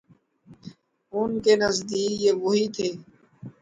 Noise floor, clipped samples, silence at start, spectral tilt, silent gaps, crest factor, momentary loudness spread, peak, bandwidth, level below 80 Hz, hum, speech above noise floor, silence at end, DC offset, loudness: -54 dBFS; under 0.1%; 0.5 s; -4 dB/octave; none; 18 dB; 19 LU; -8 dBFS; 9.4 kHz; -62 dBFS; none; 31 dB; 0.1 s; under 0.1%; -24 LUFS